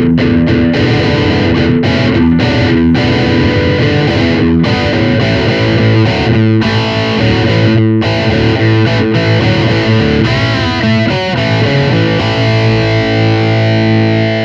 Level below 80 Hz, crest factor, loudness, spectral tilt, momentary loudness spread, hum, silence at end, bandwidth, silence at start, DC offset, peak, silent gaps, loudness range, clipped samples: -28 dBFS; 10 dB; -10 LUFS; -7 dB/octave; 2 LU; none; 0 s; 7.4 kHz; 0 s; under 0.1%; 0 dBFS; none; 1 LU; under 0.1%